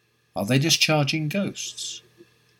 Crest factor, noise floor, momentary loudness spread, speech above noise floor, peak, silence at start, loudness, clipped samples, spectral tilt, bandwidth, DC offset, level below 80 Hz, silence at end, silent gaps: 20 dB; -56 dBFS; 15 LU; 32 dB; -6 dBFS; 0.35 s; -23 LUFS; under 0.1%; -3.5 dB/octave; 18 kHz; under 0.1%; -68 dBFS; 0.6 s; none